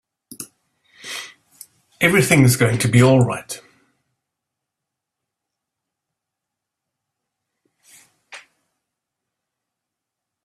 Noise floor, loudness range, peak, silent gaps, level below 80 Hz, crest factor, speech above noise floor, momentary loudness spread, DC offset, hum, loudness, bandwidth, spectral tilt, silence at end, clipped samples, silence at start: -83 dBFS; 5 LU; -2 dBFS; none; -54 dBFS; 22 dB; 69 dB; 23 LU; under 0.1%; none; -15 LUFS; 15 kHz; -5.5 dB/octave; 2.05 s; under 0.1%; 0.4 s